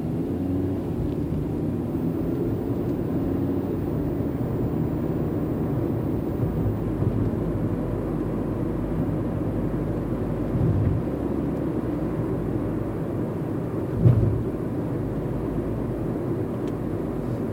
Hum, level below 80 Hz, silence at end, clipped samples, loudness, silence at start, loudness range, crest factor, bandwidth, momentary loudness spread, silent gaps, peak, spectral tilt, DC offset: none; -38 dBFS; 0 s; under 0.1%; -26 LUFS; 0 s; 1 LU; 20 dB; 16 kHz; 4 LU; none; -6 dBFS; -10 dB/octave; under 0.1%